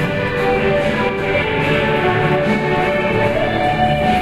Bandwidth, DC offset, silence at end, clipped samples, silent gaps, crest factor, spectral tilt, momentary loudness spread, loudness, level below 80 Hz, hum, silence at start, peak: 14.5 kHz; under 0.1%; 0 s; under 0.1%; none; 14 dB; -6.5 dB/octave; 2 LU; -16 LUFS; -34 dBFS; none; 0 s; -2 dBFS